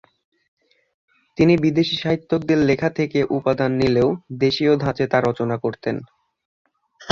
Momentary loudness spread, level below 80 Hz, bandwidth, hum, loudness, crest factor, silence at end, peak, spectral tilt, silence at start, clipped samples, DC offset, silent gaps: 7 LU; -50 dBFS; 7.4 kHz; none; -20 LUFS; 18 dB; 0 s; -2 dBFS; -7 dB/octave; 1.4 s; under 0.1%; under 0.1%; 6.45-6.65 s